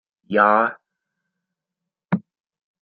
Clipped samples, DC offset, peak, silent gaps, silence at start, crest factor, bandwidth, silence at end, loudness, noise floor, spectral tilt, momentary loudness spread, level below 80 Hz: under 0.1%; under 0.1%; -2 dBFS; none; 0.3 s; 22 dB; 4.8 kHz; 0.65 s; -20 LUFS; -85 dBFS; -5 dB/octave; 11 LU; -72 dBFS